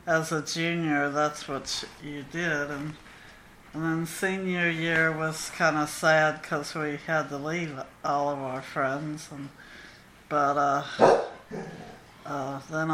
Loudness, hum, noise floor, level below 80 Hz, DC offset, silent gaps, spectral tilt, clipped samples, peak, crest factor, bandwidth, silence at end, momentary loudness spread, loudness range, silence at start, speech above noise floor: -27 LUFS; none; -51 dBFS; -60 dBFS; under 0.1%; none; -4.5 dB/octave; under 0.1%; -4 dBFS; 24 dB; 15.5 kHz; 0 s; 18 LU; 5 LU; 0.05 s; 23 dB